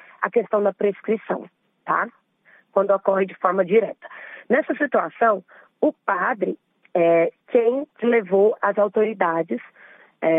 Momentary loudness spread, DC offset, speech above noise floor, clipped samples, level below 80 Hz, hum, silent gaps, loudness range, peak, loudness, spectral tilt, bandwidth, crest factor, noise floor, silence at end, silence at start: 11 LU; under 0.1%; 36 dB; under 0.1%; -78 dBFS; none; none; 3 LU; -2 dBFS; -22 LUFS; -9 dB/octave; 3.8 kHz; 20 dB; -57 dBFS; 0 s; 0.2 s